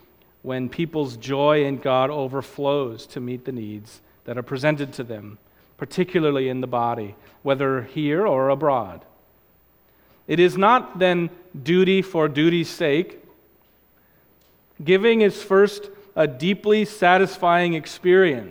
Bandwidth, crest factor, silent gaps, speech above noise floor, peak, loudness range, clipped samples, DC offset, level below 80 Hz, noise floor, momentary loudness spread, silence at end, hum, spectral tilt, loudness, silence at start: 16.5 kHz; 20 dB; none; 38 dB; -2 dBFS; 7 LU; under 0.1%; under 0.1%; -62 dBFS; -58 dBFS; 15 LU; 0 s; none; -6.5 dB/octave; -21 LUFS; 0.45 s